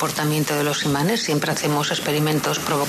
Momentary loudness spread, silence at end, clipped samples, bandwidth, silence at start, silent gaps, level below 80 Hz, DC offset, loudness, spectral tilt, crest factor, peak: 1 LU; 0 s; under 0.1%; 14 kHz; 0 s; none; -56 dBFS; under 0.1%; -21 LUFS; -4 dB/octave; 12 dB; -8 dBFS